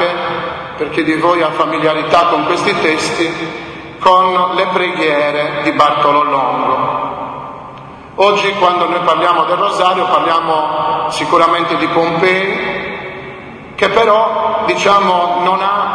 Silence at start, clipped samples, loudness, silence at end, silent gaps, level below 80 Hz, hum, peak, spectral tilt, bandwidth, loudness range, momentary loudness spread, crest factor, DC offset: 0 s; 0.1%; -13 LUFS; 0 s; none; -50 dBFS; none; 0 dBFS; -4.5 dB/octave; 10.5 kHz; 2 LU; 13 LU; 14 dB; under 0.1%